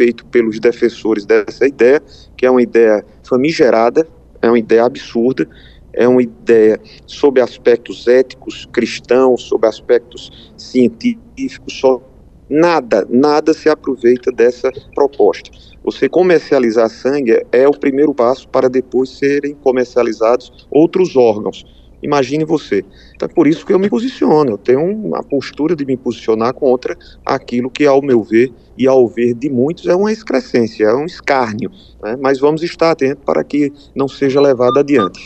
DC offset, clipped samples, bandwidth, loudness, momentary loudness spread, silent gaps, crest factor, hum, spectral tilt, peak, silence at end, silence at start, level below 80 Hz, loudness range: under 0.1%; under 0.1%; 8.4 kHz; -14 LUFS; 9 LU; none; 14 dB; none; -6.5 dB/octave; 0 dBFS; 0 s; 0 s; -48 dBFS; 3 LU